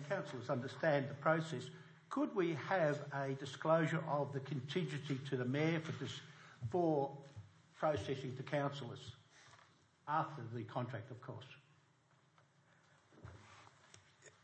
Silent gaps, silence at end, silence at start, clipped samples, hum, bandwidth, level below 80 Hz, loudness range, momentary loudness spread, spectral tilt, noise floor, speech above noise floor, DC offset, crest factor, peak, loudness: none; 0.15 s; 0 s; under 0.1%; none; 8.4 kHz; -80 dBFS; 10 LU; 19 LU; -6.5 dB/octave; -73 dBFS; 33 dB; under 0.1%; 22 dB; -20 dBFS; -40 LUFS